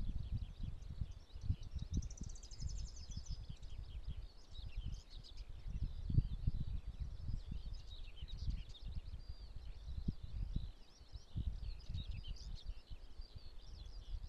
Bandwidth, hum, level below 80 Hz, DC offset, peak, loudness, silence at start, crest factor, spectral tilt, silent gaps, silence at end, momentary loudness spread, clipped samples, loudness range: 8.4 kHz; none; -46 dBFS; under 0.1%; -22 dBFS; -49 LUFS; 0 s; 22 dB; -6 dB/octave; none; 0 s; 11 LU; under 0.1%; 6 LU